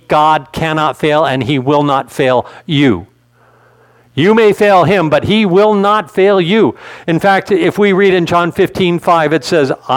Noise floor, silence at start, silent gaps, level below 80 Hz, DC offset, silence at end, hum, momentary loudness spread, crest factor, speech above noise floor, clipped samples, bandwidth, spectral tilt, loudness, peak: -49 dBFS; 0.1 s; none; -46 dBFS; under 0.1%; 0 s; none; 6 LU; 12 dB; 38 dB; under 0.1%; 16.5 kHz; -6.5 dB/octave; -11 LUFS; 0 dBFS